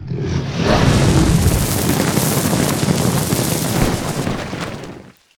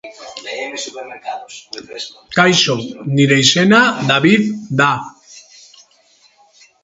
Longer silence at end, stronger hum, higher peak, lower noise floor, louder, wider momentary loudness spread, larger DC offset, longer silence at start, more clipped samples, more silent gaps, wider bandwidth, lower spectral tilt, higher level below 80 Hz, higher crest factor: second, 0.3 s vs 1.45 s; neither; about the same, 0 dBFS vs 0 dBFS; second, -37 dBFS vs -53 dBFS; second, -17 LUFS vs -13 LUFS; second, 11 LU vs 20 LU; neither; about the same, 0 s vs 0.05 s; neither; neither; first, 19 kHz vs 8 kHz; about the same, -5 dB/octave vs -4 dB/octave; first, -28 dBFS vs -56 dBFS; about the same, 16 dB vs 16 dB